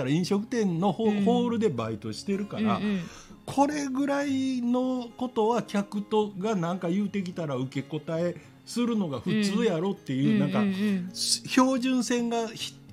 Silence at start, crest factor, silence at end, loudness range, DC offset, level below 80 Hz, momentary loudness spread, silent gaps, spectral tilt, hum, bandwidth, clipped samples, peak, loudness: 0 s; 20 dB; 0 s; 4 LU; under 0.1%; -66 dBFS; 8 LU; none; -5.5 dB/octave; none; 15.5 kHz; under 0.1%; -8 dBFS; -28 LUFS